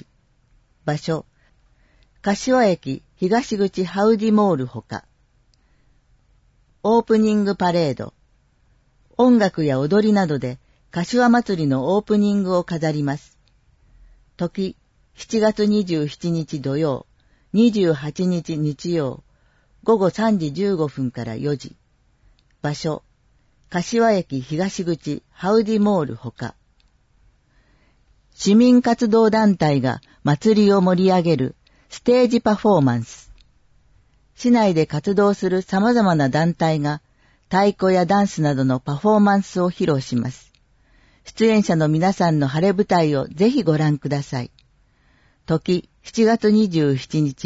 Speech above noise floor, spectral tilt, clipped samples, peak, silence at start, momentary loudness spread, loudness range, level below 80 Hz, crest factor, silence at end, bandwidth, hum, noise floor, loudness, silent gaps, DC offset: 41 dB; -7 dB/octave; under 0.1%; -4 dBFS; 0.85 s; 13 LU; 6 LU; -54 dBFS; 14 dB; 0 s; 8 kHz; none; -60 dBFS; -19 LUFS; none; under 0.1%